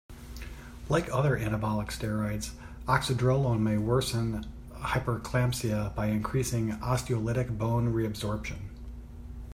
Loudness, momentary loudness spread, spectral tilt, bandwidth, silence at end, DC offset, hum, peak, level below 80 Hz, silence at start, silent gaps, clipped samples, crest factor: -30 LUFS; 17 LU; -6 dB/octave; 16 kHz; 0 s; under 0.1%; none; -12 dBFS; -44 dBFS; 0.1 s; none; under 0.1%; 18 dB